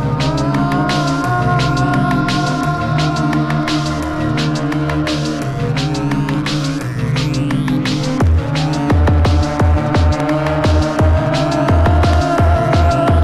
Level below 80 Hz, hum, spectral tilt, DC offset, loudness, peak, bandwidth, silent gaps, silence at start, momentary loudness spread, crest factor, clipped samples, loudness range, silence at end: -22 dBFS; none; -6.5 dB/octave; 0.3%; -15 LUFS; -6 dBFS; 12.5 kHz; none; 0 s; 5 LU; 10 dB; under 0.1%; 4 LU; 0 s